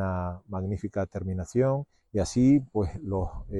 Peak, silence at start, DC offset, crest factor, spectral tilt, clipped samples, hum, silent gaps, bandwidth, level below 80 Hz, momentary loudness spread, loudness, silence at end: -12 dBFS; 0 s; under 0.1%; 16 dB; -7.5 dB/octave; under 0.1%; none; none; 11.5 kHz; -44 dBFS; 11 LU; -28 LUFS; 0 s